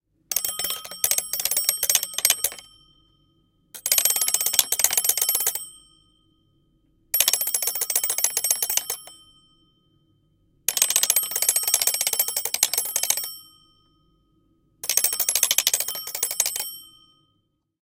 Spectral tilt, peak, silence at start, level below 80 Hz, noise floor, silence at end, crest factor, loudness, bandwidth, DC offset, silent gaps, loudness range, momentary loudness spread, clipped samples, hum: 2.5 dB/octave; 0 dBFS; 0.3 s; -64 dBFS; -71 dBFS; 1 s; 26 dB; -21 LUFS; 17.5 kHz; under 0.1%; none; 3 LU; 9 LU; under 0.1%; none